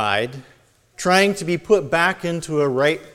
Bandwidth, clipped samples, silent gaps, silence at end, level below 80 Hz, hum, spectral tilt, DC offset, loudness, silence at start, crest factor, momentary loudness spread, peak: 16 kHz; under 0.1%; none; 0.05 s; -54 dBFS; none; -4.5 dB/octave; under 0.1%; -19 LUFS; 0 s; 18 dB; 9 LU; -2 dBFS